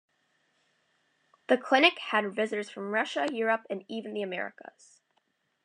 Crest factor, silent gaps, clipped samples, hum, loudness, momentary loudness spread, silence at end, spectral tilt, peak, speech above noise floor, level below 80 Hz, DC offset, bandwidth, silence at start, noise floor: 24 dB; none; under 0.1%; none; -28 LUFS; 14 LU; 1.15 s; -4 dB/octave; -8 dBFS; 46 dB; under -90 dBFS; under 0.1%; 10.5 kHz; 1.5 s; -75 dBFS